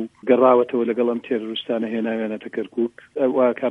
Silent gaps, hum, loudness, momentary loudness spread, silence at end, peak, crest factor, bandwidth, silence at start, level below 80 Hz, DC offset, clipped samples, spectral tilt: none; none; -21 LUFS; 11 LU; 0 s; -4 dBFS; 18 dB; 4 kHz; 0 s; -70 dBFS; under 0.1%; under 0.1%; -7.5 dB/octave